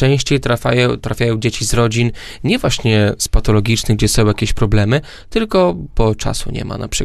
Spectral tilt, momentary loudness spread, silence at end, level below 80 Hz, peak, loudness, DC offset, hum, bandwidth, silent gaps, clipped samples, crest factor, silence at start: -5 dB/octave; 7 LU; 0 s; -24 dBFS; 0 dBFS; -16 LUFS; under 0.1%; none; 13 kHz; none; under 0.1%; 14 dB; 0 s